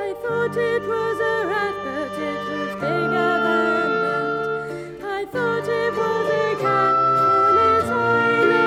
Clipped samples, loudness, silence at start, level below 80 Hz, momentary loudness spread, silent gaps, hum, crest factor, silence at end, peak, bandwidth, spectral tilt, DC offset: under 0.1%; -20 LUFS; 0 s; -56 dBFS; 10 LU; none; none; 14 dB; 0 s; -6 dBFS; 14 kHz; -6 dB/octave; under 0.1%